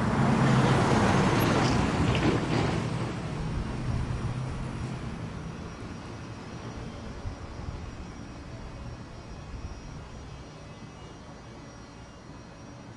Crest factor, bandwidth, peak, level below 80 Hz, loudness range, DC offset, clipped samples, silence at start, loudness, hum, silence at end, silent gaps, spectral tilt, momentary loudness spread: 20 dB; 12 kHz; -10 dBFS; -42 dBFS; 18 LU; under 0.1%; under 0.1%; 0 s; -28 LUFS; none; 0 s; none; -6 dB/octave; 22 LU